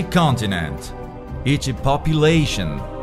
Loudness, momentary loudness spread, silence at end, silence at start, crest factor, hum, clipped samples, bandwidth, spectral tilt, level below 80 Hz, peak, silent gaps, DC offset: -19 LUFS; 16 LU; 0 s; 0 s; 16 dB; none; under 0.1%; 14 kHz; -5.5 dB/octave; -32 dBFS; -4 dBFS; none; under 0.1%